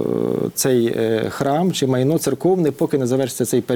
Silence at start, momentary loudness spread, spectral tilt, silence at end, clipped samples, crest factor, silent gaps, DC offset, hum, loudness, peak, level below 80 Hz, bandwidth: 0 s; 3 LU; -5.5 dB/octave; 0 s; under 0.1%; 14 dB; none; under 0.1%; none; -19 LUFS; -4 dBFS; -58 dBFS; over 20 kHz